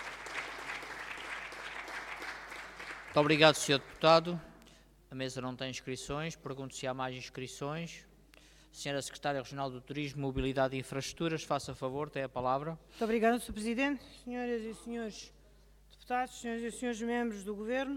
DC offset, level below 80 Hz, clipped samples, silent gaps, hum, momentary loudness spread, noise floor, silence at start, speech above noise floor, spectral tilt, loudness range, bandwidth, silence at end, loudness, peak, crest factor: under 0.1%; -58 dBFS; under 0.1%; none; none; 14 LU; -61 dBFS; 0 s; 27 dB; -4.5 dB/octave; 10 LU; 16.5 kHz; 0 s; -35 LUFS; -8 dBFS; 26 dB